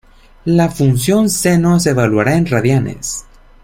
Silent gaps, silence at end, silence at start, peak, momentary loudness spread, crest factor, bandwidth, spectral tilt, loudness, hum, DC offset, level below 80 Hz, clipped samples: none; 0.4 s; 0.45 s; 0 dBFS; 10 LU; 14 dB; 16.5 kHz; -5.5 dB/octave; -14 LUFS; none; under 0.1%; -38 dBFS; under 0.1%